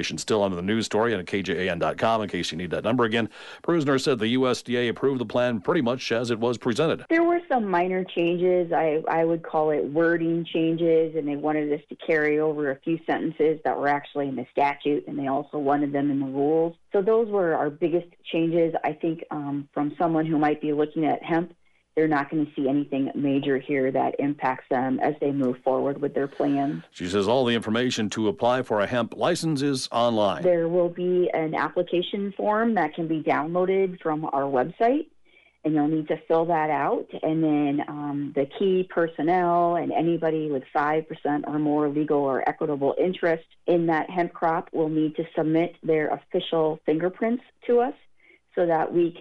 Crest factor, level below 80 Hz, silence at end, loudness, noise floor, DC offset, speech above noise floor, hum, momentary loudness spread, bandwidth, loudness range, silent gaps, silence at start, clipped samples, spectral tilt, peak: 14 dB; -64 dBFS; 0 s; -25 LUFS; -58 dBFS; under 0.1%; 34 dB; none; 5 LU; 11.5 kHz; 2 LU; none; 0 s; under 0.1%; -6 dB/octave; -10 dBFS